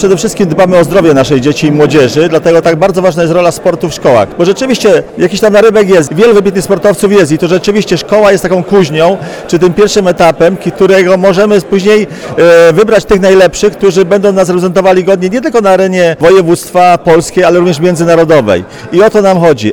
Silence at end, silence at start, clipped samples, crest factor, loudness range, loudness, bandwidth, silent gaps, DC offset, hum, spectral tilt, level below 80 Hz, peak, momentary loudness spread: 0 s; 0 s; 10%; 6 dB; 2 LU; -7 LUFS; 18 kHz; none; 0.4%; none; -5.5 dB/octave; -36 dBFS; 0 dBFS; 5 LU